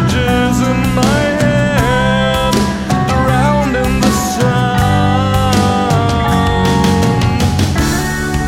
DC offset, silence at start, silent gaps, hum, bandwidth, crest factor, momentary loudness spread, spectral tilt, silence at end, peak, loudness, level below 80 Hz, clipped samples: under 0.1%; 0 s; none; none; 16.5 kHz; 12 dB; 2 LU; -5.5 dB/octave; 0 s; 0 dBFS; -13 LUFS; -24 dBFS; under 0.1%